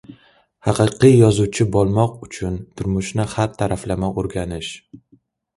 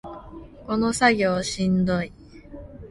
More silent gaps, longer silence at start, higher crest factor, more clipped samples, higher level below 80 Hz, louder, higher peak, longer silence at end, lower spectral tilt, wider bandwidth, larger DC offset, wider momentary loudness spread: neither; about the same, 0.1 s vs 0.05 s; about the same, 18 dB vs 20 dB; neither; first, -40 dBFS vs -46 dBFS; first, -19 LUFS vs -22 LUFS; first, 0 dBFS vs -4 dBFS; first, 0.6 s vs 0 s; first, -6.5 dB/octave vs -5 dB/octave; about the same, 11.5 kHz vs 11.5 kHz; neither; second, 14 LU vs 24 LU